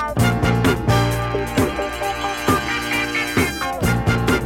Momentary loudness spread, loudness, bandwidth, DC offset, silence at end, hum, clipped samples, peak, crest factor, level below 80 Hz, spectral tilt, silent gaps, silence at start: 5 LU; -19 LUFS; 17 kHz; under 0.1%; 0 s; none; under 0.1%; -4 dBFS; 16 dB; -32 dBFS; -5 dB/octave; none; 0 s